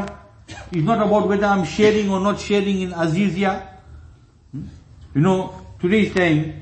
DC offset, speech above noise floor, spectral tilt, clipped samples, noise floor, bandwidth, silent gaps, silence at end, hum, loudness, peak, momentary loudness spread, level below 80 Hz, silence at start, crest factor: under 0.1%; 29 dB; -6.5 dB/octave; under 0.1%; -47 dBFS; 8.6 kHz; none; 0 s; none; -19 LUFS; -2 dBFS; 18 LU; -44 dBFS; 0 s; 18 dB